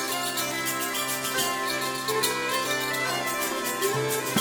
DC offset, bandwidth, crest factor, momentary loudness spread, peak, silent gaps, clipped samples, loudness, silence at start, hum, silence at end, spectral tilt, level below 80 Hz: under 0.1%; over 20 kHz; 18 dB; 2 LU; -8 dBFS; none; under 0.1%; -26 LUFS; 0 s; none; 0 s; -2 dB/octave; -64 dBFS